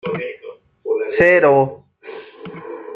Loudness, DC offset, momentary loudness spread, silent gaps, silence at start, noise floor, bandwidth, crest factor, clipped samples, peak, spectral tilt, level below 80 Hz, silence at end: -15 LUFS; under 0.1%; 24 LU; none; 0.05 s; -39 dBFS; 6.4 kHz; 16 dB; under 0.1%; -2 dBFS; -8 dB/octave; -56 dBFS; 0 s